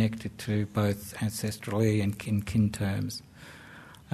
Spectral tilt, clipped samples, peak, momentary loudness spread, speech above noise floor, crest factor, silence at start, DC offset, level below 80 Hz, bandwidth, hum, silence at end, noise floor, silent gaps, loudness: -6.5 dB/octave; under 0.1%; -12 dBFS; 21 LU; 21 dB; 18 dB; 0 s; under 0.1%; -54 dBFS; 13.5 kHz; none; 0 s; -50 dBFS; none; -30 LUFS